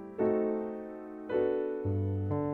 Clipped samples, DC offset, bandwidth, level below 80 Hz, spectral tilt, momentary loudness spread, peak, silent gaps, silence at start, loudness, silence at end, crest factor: under 0.1%; under 0.1%; 4.2 kHz; -62 dBFS; -11 dB/octave; 12 LU; -18 dBFS; none; 0 s; -32 LUFS; 0 s; 14 dB